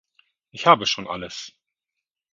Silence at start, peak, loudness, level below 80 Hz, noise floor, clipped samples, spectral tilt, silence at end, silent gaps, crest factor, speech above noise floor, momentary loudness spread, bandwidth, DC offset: 0.55 s; 0 dBFS; -20 LUFS; -62 dBFS; -85 dBFS; under 0.1%; -3 dB/octave; 0.85 s; none; 24 dB; 63 dB; 23 LU; 7.6 kHz; under 0.1%